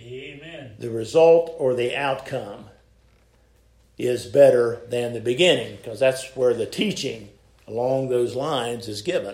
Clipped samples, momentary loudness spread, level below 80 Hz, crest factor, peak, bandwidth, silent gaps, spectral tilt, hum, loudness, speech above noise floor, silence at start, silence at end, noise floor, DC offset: under 0.1%; 20 LU; -58 dBFS; 20 dB; -4 dBFS; 15 kHz; none; -5 dB/octave; none; -22 LUFS; 36 dB; 0 s; 0 s; -58 dBFS; under 0.1%